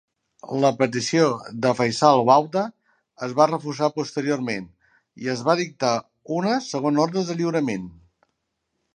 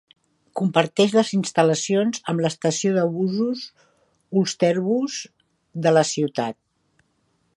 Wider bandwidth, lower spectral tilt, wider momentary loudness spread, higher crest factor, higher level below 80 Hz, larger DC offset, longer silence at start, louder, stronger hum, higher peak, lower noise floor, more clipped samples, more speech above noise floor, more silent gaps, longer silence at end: about the same, 11 kHz vs 11.5 kHz; about the same, -5 dB/octave vs -5 dB/octave; about the same, 12 LU vs 12 LU; about the same, 20 dB vs 22 dB; about the same, -66 dBFS vs -70 dBFS; neither; about the same, 0.45 s vs 0.55 s; about the same, -22 LUFS vs -22 LUFS; neither; about the same, -2 dBFS vs 0 dBFS; first, -77 dBFS vs -68 dBFS; neither; first, 55 dB vs 47 dB; neither; about the same, 1.05 s vs 1.05 s